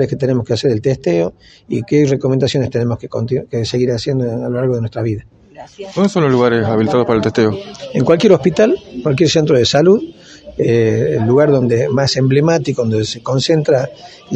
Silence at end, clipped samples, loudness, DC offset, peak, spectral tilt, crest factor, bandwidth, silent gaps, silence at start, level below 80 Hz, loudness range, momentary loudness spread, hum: 0 s; under 0.1%; -14 LUFS; under 0.1%; 0 dBFS; -6.5 dB/octave; 14 dB; 8.6 kHz; none; 0 s; -46 dBFS; 4 LU; 9 LU; none